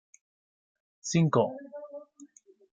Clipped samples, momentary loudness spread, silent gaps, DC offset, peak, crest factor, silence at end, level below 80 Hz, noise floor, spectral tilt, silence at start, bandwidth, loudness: under 0.1%; 21 LU; none; under 0.1%; -10 dBFS; 22 dB; 0.5 s; -74 dBFS; -56 dBFS; -6 dB/octave; 1.05 s; 9.2 kHz; -28 LUFS